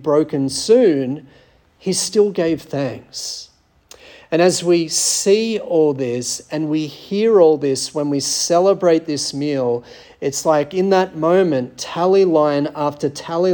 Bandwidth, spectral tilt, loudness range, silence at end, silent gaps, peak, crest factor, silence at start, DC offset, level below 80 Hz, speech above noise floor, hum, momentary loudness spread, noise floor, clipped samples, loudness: 18 kHz; -4 dB/octave; 3 LU; 0 s; none; -2 dBFS; 16 dB; 0 s; under 0.1%; -60 dBFS; 31 dB; none; 11 LU; -48 dBFS; under 0.1%; -17 LUFS